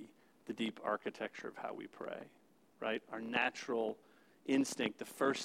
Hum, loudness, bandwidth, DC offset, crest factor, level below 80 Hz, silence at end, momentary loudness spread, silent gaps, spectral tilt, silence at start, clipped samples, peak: none; -40 LUFS; 16 kHz; under 0.1%; 22 dB; under -90 dBFS; 0 s; 14 LU; none; -3.5 dB/octave; 0 s; under 0.1%; -18 dBFS